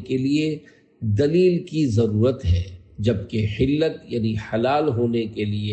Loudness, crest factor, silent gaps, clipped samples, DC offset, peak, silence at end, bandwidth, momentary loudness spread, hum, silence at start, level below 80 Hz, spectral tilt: -22 LUFS; 14 dB; none; under 0.1%; under 0.1%; -8 dBFS; 0 s; 8.4 kHz; 7 LU; none; 0 s; -44 dBFS; -8 dB/octave